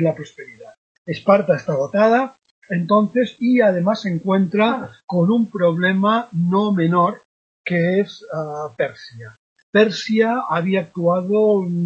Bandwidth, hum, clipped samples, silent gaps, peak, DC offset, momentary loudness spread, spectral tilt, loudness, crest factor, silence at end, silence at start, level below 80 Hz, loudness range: 7.4 kHz; none; under 0.1%; 0.78-1.05 s, 2.51-2.62 s, 5.04-5.08 s, 7.25-7.65 s, 9.39-9.56 s, 9.63-9.73 s; -2 dBFS; under 0.1%; 12 LU; -7.5 dB/octave; -19 LUFS; 18 dB; 0 s; 0 s; -66 dBFS; 3 LU